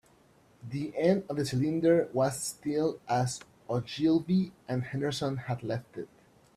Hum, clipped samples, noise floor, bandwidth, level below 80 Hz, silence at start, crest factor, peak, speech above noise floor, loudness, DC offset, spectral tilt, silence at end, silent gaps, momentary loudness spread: none; under 0.1%; -62 dBFS; 14 kHz; -64 dBFS; 0.65 s; 18 dB; -12 dBFS; 33 dB; -30 LUFS; under 0.1%; -6 dB/octave; 0.5 s; none; 12 LU